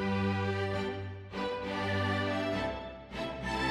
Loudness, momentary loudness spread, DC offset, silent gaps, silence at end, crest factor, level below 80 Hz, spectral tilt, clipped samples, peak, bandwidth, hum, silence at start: -34 LUFS; 9 LU; under 0.1%; none; 0 s; 14 dB; -52 dBFS; -6 dB/octave; under 0.1%; -20 dBFS; 11.5 kHz; none; 0 s